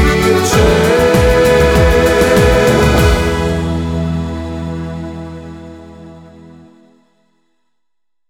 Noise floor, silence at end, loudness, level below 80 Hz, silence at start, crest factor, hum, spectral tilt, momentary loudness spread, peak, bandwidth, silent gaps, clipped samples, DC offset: -82 dBFS; 2.05 s; -12 LUFS; -22 dBFS; 0 s; 12 dB; none; -5.5 dB/octave; 17 LU; 0 dBFS; 19 kHz; none; under 0.1%; under 0.1%